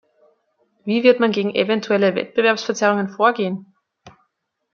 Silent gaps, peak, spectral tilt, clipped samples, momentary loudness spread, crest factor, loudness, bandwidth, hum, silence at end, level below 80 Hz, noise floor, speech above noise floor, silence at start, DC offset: none; -2 dBFS; -5 dB/octave; under 0.1%; 9 LU; 18 dB; -18 LUFS; 7.2 kHz; none; 0.65 s; -70 dBFS; -73 dBFS; 55 dB; 0.85 s; under 0.1%